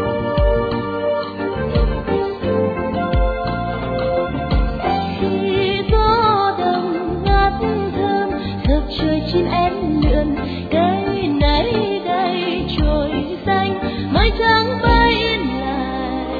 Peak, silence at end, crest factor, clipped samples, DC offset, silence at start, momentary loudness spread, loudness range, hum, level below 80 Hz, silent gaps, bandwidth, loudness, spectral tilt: 0 dBFS; 0 s; 16 dB; under 0.1%; under 0.1%; 0 s; 7 LU; 3 LU; none; -24 dBFS; none; 4.9 kHz; -18 LUFS; -8.5 dB/octave